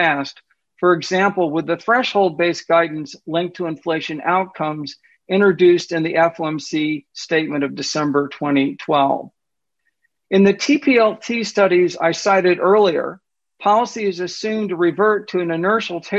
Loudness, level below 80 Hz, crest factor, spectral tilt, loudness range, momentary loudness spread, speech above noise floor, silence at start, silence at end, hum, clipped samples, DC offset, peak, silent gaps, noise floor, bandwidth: -18 LUFS; -64 dBFS; 14 dB; -5 dB/octave; 4 LU; 9 LU; 64 dB; 0 s; 0 s; none; under 0.1%; under 0.1%; -4 dBFS; none; -81 dBFS; 8 kHz